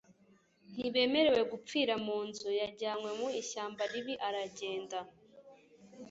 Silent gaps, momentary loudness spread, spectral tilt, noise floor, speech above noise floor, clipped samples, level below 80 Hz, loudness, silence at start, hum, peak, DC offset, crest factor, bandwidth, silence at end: none; 12 LU; -1.5 dB/octave; -67 dBFS; 33 dB; under 0.1%; -74 dBFS; -35 LUFS; 0.7 s; none; -16 dBFS; under 0.1%; 20 dB; 8 kHz; 0 s